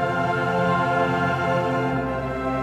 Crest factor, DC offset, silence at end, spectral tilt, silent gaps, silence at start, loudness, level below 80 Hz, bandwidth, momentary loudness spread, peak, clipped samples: 12 dB; under 0.1%; 0 s; -7 dB/octave; none; 0 s; -22 LUFS; -44 dBFS; 13 kHz; 5 LU; -10 dBFS; under 0.1%